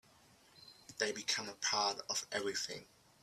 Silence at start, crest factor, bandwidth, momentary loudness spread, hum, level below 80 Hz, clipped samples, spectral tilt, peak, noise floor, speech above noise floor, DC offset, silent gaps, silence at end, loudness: 0.55 s; 22 dB; 15.5 kHz; 21 LU; none; -80 dBFS; under 0.1%; -0.5 dB/octave; -18 dBFS; -66 dBFS; 27 dB; under 0.1%; none; 0.4 s; -37 LUFS